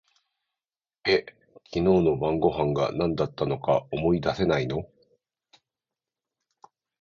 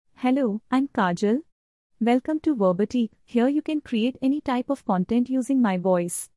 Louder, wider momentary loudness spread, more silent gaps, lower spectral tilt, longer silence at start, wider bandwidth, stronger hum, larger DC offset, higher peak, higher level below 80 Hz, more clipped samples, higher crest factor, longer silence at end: about the same, -25 LUFS vs -24 LUFS; first, 9 LU vs 4 LU; second, none vs 1.52-1.90 s; first, -7.5 dB/octave vs -6 dB/octave; first, 1.05 s vs 0.2 s; second, 7 kHz vs 12 kHz; neither; neither; about the same, -8 dBFS vs -10 dBFS; first, -50 dBFS vs -62 dBFS; neither; about the same, 18 dB vs 14 dB; first, 2.15 s vs 0.1 s